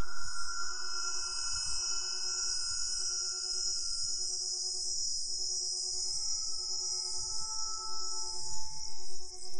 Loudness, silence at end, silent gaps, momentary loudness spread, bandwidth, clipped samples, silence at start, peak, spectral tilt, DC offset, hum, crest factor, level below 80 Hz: -33 LUFS; 0 s; none; 7 LU; 11.5 kHz; under 0.1%; 0 s; -20 dBFS; 1.5 dB/octave; under 0.1%; none; 12 dB; -56 dBFS